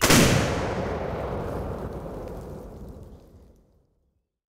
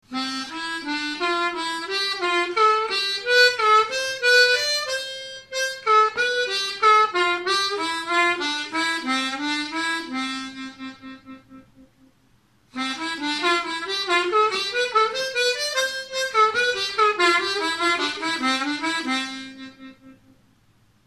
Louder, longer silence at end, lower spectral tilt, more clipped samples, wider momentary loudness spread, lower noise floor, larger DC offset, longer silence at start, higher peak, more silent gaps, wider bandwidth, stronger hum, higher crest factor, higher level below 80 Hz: second, -26 LUFS vs -21 LUFS; first, 1.1 s vs 0.95 s; first, -4 dB/octave vs -0.5 dB/octave; neither; first, 23 LU vs 12 LU; first, -72 dBFS vs -61 dBFS; neither; about the same, 0 s vs 0.1 s; about the same, -4 dBFS vs -6 dBFS; neither; first, 16 kHz vs 14 kHz; neither; first, 24 dB vs 18 dB; first, -40 dBFS vs -66 dBFS